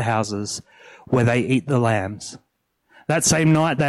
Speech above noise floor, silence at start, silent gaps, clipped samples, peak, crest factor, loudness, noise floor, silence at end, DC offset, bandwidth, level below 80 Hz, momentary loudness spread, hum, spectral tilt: 44 dB; 0 s; none; under 0.1%; -6 dBFS; 14 dB; -20 LUFS; -65 dBFS; 0 s; under 0.1%; 13.5 kHz; -52 dBFS; 16 LU; none; -5 dB/octave